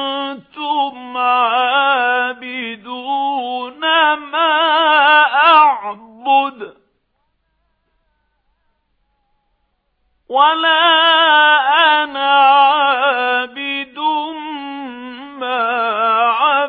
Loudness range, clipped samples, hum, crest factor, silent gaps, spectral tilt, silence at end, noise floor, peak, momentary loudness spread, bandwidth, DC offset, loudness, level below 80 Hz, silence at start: 8 LU; under 0.1%; none; 16 dB; none; -4 dB/octave; 0 s; -67 dBFS; 0 dBFS; 17 LU; 5 kHz; under 0.1%; -13 LUFS; -68 dBFS; 0 s